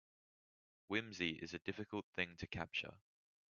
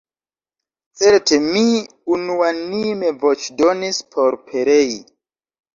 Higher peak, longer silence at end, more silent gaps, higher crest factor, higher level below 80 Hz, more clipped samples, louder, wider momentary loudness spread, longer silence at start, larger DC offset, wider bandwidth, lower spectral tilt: second, -22 dBFS vs -2 dBFS; second, 0.5 s vs 0.7 s; first, 2.03-2.13 s vs none; first, 24 dB vs 16 dB; second, -72 dBFS vs -60 dBFS; neither; second, -44 LUFS vs -17 LUFS; second, 5 LU vs 8 LU; about the same, 0.9 s vs 1 s; neither; about the same, 7.2 kHz vs 7.6 kHz; about the same, -2.5 dB/octave vs -3.5 dB/octave